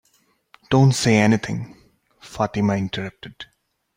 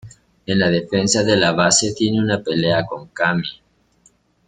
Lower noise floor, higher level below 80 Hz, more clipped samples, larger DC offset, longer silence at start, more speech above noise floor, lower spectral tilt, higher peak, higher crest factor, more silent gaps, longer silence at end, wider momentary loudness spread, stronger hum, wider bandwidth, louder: first, -63 dBFS vs -57 dBFS; about the same, -52 dBFS vs -52 dBFS; neither; neither; first, 0.7 s vs 0.05 s; first, 44 dB vs 40 dB; first, -6 dB/octave vs -3.5 dB/octave; about the same, -4 dBFS vs -2 dBFS; about the same, 18 dB vs 18 dB; neither; second, 0.55 s vs 0.95 s; first, 23 LU vs 9 LU; neither; first, 16 kHz vs 9.6 kHz; second, -20 LUFS vs -17 LUFS